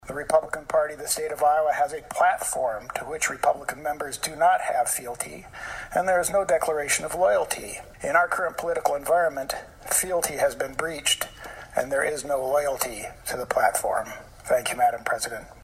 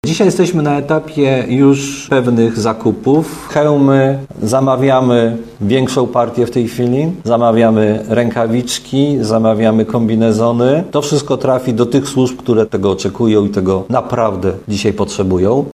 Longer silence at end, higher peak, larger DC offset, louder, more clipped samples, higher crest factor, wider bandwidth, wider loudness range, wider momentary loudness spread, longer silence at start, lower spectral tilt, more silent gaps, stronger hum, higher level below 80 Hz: about the same, 0 s vs 0.05 s; second, -6 dBFS vs 0 dBFS; neither; second, -25 LUFS vs -13 LUFS; neither; first, 20 dB vs 12 dB; first, 16 kHz vs 14.5 kHz; about the same, 2 LU vs 1 LU; first, 10 LU vs 5 LU; about the same, 0.05 s vs 0.05 s; second, -1.5 dB/octave vs -6.5 dB/octave; neither; neither; second, -52 dBFS vs -46 dBFS